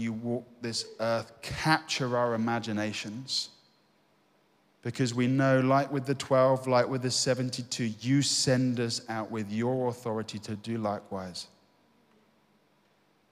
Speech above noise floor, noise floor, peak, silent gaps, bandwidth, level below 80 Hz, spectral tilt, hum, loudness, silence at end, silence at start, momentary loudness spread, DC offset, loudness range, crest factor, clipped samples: 39 dB; -68 dBFS; -10 dBFS; none; 15 kHz; -64 dBFS; -4.5 dB/octave; 50 Hz at -65 dBFS; -29 LUFS; 1.85 s; 0 s; 13 LU; under 0.1%; 8 LU; 20 dB; under 0.1%